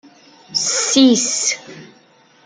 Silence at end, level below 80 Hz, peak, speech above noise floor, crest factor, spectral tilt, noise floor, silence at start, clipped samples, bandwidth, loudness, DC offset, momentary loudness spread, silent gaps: 0.6 s; -68 dBFS; -2 dBFS; 36 dB; 18 dB; -1.5 dB/octave; -51 dBFS; 0.5 s; under 0.1%; 10 kHz; -15 LUFS; under 0.1%; 10 LU; none